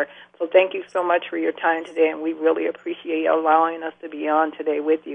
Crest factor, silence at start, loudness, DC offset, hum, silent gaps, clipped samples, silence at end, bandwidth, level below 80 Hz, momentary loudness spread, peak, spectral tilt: 18 dB; 0 s; -22 LUFS; under 0.1%; 60 Hz at -60 dBFS; none; under 0.1%; 0 s; 8.4 kHz; -76 dBFS; 11 LU; -2 dBFS; -5 dB/octave